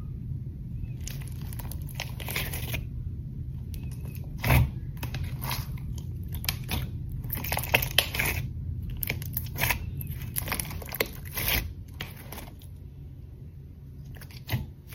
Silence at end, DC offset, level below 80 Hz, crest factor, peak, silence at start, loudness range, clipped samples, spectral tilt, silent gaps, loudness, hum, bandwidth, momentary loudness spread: 0 s; under 0.1%; -38 dBFS; 30 dB; -2 dBFS; 0 s; 7 LU; under 0.1%; -4 dB/octave; none; -31 LUFS; none; 17 kHz; 19 LU